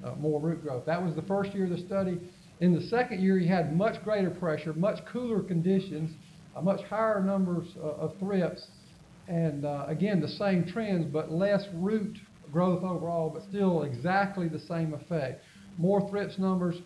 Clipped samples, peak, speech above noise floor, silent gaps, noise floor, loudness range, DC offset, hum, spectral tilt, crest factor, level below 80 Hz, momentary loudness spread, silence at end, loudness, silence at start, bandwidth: under 0.1%; -14 dBFS; 24 dB; none; -53 dBFS; 3 LU; under 0.1%; none; -8 dB/octave; 16 dB; -64 dBFS; 8 LU; 0 s; -30 LUFS; 0 s; 11 kHz